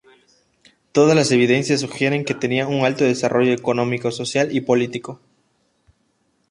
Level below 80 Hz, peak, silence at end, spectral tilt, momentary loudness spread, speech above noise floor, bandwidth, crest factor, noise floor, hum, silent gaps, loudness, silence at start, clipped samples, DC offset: -62 dBFS; -2 dBFS; 1.35 s; -5 dB/octave; 7 LU; 47 dB; 11.5 kHz; 18 dB; -66 dBFS; none; none; -19 LUFS; 0.95 s; under 0.1%; under 0.1%